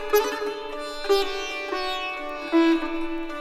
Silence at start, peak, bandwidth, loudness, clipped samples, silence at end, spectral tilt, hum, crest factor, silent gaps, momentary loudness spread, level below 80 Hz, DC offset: 0 s; -8 dBFS; 15.5 kHz; -25 LUFS; under 0.1%; 0 s; -2.5 dB/octave; none; 16 dB; none; 10 LU; -46 dBFS; under 0.1%